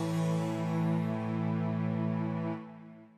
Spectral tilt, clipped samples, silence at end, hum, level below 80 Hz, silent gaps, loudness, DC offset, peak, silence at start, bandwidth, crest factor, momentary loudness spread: -8 dB/octave; under 0.1%; 0.1 s; none; -74 dBFS; none; -33 LUFS; under 0.1%; -20 dBFS; 0 s; 10.5 kHz; 12 dB; 8 LU